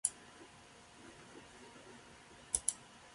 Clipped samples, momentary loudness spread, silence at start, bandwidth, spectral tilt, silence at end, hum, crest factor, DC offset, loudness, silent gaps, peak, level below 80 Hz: under 0.1%; 21 LU; 0.05 s; 11.5 kHz; -0.5 dB/octave; 0 s; none; 32 dB; under 0.1%; -38 LUFS; none; -14 dBFS; -68 dBFS